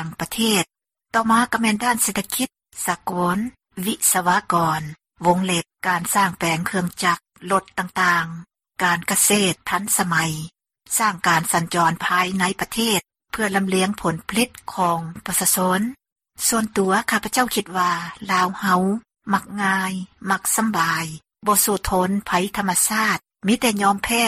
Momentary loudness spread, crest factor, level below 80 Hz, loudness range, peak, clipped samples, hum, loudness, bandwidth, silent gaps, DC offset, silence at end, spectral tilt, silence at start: 9 LU; 18 dB; -50 dBFS; 2 LU; -2 dBFS; under 0.1%; none; -20 LUFS; 16 kHz; 16.12-16.16 s; under 0.1%; 0 s; -3 dB/octave; 0 s